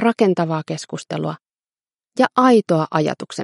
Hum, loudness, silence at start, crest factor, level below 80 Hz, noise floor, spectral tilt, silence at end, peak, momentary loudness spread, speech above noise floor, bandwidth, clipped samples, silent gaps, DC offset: none; -19 LUFS; 0 s; 18 dB; -68 dBFS; under -90 dBFS; -6 dB/octave; 0 s; 0 dBFS; 14 LU; over 72 dB; 11.5 kHz; under 0.1%; 1.95-1.99 s; under 0.1%